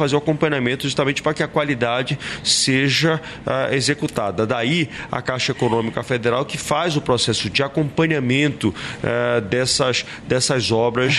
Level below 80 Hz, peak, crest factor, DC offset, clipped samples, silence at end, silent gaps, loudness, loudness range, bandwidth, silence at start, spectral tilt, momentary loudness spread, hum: -50 dBFS; -4 dBFS; 16 dB; under 0.1%; under 0.1%; 0 s; none; -19 LUFS; 2 LU; 13 kHz; 0 s; -4 dB/octave; 6 LU; none